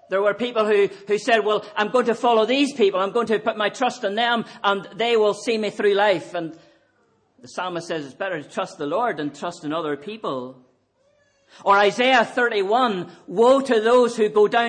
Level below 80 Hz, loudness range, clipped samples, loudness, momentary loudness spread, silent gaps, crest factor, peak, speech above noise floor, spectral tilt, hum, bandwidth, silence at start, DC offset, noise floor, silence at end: -70 dBFS; 9 LU; under 0.1%; -21 LUFS; 12 LU; none; 16 dB; -6 dBFS; 43 dB; -4 dB/octave; none; 10 kHz; 0.1 s; under 0.1%; -63 dBFS; 0 s